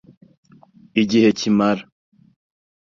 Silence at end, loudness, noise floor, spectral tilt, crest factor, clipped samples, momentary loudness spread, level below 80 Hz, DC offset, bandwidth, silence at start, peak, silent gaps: 1.1 s; -18 LUFS; -50 dBFS; -5.5 dB/octave; 18 dB; under 0.1%; 8 LU; -60 dBFS; under 0.1%; 7.4 kHz; 0.95 s; -2 dBFS; none